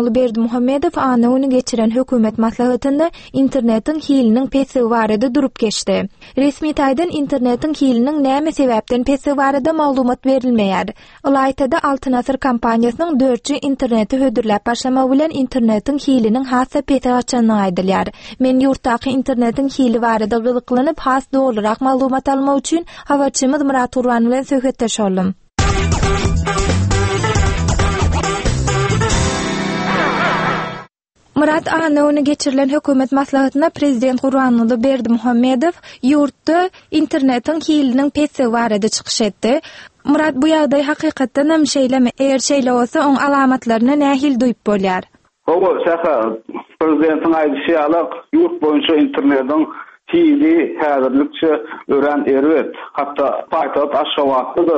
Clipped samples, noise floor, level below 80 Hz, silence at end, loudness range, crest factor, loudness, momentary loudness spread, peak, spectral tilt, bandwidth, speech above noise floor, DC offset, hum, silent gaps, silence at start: under 0.1%; -54 dBFS; -32 dBFS; 0 s; 2 LU; 12 dB; -15 LUFS; 4 LU; -2 dBFS; -5.5 dB/octave; 8.8 kHz; 40 dB; under 0.1%; none; none; 0 s